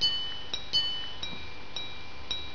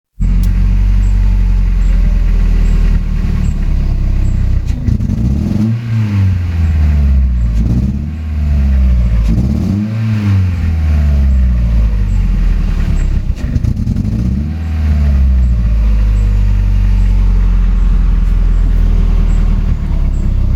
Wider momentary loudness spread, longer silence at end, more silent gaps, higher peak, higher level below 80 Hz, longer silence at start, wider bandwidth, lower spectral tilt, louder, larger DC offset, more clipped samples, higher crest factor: first, 13 LU vs 4 LU; about the same, 0 s vs 0 s; neither; second, -14 dBFS vs 0 dBFS; second, -54 dBFS vs -12 dBFS; second, 0 s vs 0.2 s; second, 5.4 kHz vs 7.6 kHz; second, -2 dB/octave vs -8.5 dB/octave; second, -32 LUFS vs -14 LUFS; first, 2% vs under 0.1%; neither; first, 18 dB vs 10 dB